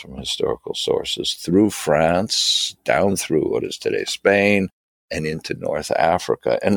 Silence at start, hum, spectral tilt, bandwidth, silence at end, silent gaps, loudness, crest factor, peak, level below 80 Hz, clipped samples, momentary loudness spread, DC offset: 0 s; none; -4 dB/octave; 19 kHz; 0 s; 4.73-5.08 s; -20 LUFS; 18 dB; -2 dBFS; -50 dBFS; under 0.1%; 9 LU; under 0.1%